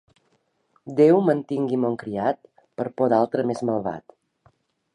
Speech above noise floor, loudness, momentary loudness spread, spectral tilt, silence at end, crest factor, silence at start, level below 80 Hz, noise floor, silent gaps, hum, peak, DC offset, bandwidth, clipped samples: 47 dB; -22 LUFS; 15 LU; -8.5 dB/octave; 0.95 s; 18 dB; 0.85 s; -66 dBFS; -68 dBFS; none; none; -6 dBFS; under 0.1%; 10.5 kHz; under 0.1%